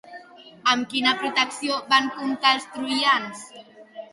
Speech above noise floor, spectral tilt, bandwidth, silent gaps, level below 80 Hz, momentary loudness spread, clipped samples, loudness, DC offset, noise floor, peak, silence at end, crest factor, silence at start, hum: 22 dB; -1.5 dB/octave; 11.5 kHz; none; -72 dBFS; 18 LU; under 0.1%; -22 LUFS; under 0.1%; -45 dBFS; -4 dBFS; 0.1 s; 20 dB; 0.05 s; none